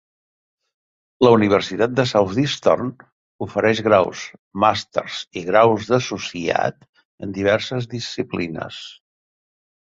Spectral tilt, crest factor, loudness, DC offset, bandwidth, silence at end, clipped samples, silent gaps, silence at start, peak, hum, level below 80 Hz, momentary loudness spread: -5.5 dB/octave; 20 dB; -19 LUFS; under 0.1%; 7.8 kHz; 0.9 s; under 0.1%; 3.12-3.39 s, 4.39-4.51 s, 6.89-6.93 s, 7.05-7.18 s; 1.2 s; -2 dBFS; none; -54 dBFS; 15 LU